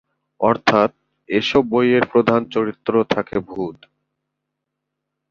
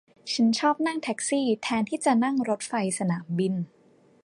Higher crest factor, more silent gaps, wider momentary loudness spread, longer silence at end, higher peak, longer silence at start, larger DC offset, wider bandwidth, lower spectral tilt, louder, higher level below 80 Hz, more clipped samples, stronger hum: about the same, 18 dB vs 16 dB; neither; first, 9 LU vs 6 LU; first, 1.55 s vs 0.6 s; first, -2 dBFS vs -10 dBFS; first, 0.4 s vs 0.25 s; neither; second, 7.4 kHz vs 11.5 kHz; first, -6 dB/octave vs -4.5 dB/octave; first, -18 LUFS vs -26 LUFS; first, -54 dBFS vs -72 dBFS; neither; first, 50 Hz at -50 dBFS vs none